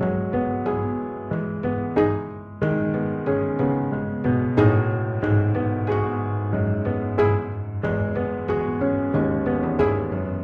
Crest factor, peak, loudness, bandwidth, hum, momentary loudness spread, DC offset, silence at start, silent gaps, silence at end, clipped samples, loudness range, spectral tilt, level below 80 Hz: 18 dB; -4 dBFS; -23 LUFS; 4.8 kHz; none; 6 LU; under 0.1%; 0 s; none; 0 s; under 0.1%; 2 LU; -10.5 dB/octave; -44 dBFS